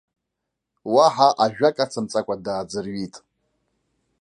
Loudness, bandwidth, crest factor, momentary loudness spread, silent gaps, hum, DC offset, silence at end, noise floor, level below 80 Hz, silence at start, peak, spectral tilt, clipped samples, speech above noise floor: -21 LUFS; 10.5 kHz; 20 dB; 15 LU; none; none; under 0.1%; 1 s; -81 dBFS; -64 dBFS; 0.85 s; -2 dBFS; -4.5 dB/octave; under 0.1%; 61 dB